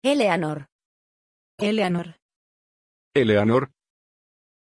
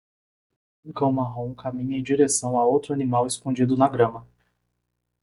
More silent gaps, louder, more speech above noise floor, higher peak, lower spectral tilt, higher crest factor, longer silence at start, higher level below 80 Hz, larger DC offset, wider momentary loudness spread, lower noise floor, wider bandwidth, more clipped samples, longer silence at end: first, 0.72-0.79 s, 0.85-1.58 s, 2.22-2.29 s, 2.36-3.11 s vs none; about the same, -22 LUFS vs -23 LUFS; first, over 69 dB vs 49 dB; about the same, -6 dBFS vs -4 dBFS; about the same, -6 dB/octave vs -5.5 dB/octave; about the same, 18 dB vs 20 dB; second, 0.05 s vs 0.85 s; about the same, -64 dBFS vs -60 dBFS; neither; first, 15 LU vs 10 LU; first, under -90 dBFS vs -72 dBFS; about the same, 11 kHz vs 11.5 kHz; neither; about the same, 0.95 s vs 1 s